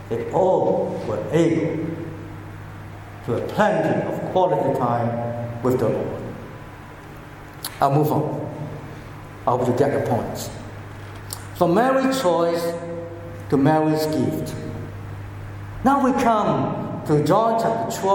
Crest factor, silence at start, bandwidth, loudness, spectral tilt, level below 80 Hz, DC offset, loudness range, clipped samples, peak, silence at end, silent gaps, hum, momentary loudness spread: 18 dB; 0 s; 17.5 kHz; -21 LUFS; -6.5 dB/octave; -48 dBFS; under 0.1%; 4 LU; under 0.1%; -4 dBFS; 0 s; none; none; 18 LU